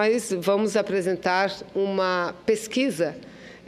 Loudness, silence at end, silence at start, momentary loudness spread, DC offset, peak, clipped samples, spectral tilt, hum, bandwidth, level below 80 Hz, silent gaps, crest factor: -24 LUFS; 0.1 s; 0 s; 5 LU; under 0.1%; -8 dBFS; under 0.1%; -4.5 dB/octave; none; 15.5 kHz; -64 dBFS; none; 16 dB